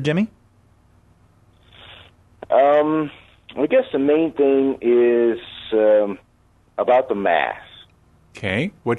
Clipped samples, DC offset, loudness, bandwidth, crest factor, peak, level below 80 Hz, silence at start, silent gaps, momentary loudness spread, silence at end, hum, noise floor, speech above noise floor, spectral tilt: under 0.1%; under 0.1%; -19 LUFS; 8.6 kHz; 14 dB; -6 dBFS; -58 dBFS; 0 s; none; 13 LU; 0 s; 60 Hz at -50 dBFS; -57 dBFS; 39 dB; -7.5 dB/octave